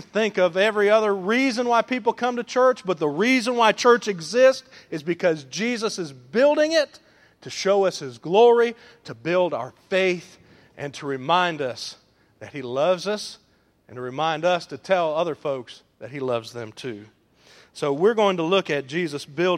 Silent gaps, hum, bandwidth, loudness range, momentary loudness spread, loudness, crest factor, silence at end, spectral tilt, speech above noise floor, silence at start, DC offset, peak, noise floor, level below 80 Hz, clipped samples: none; none; 13 kHz; 6 LU; 16 LU; -22 LUFS; 20 dB; 0 s; -4.5 dB/octave; 32 dB; 0 s; under 0.1%; -2 dBFS; -54 dBFS; -72 dBFS; under 0.1%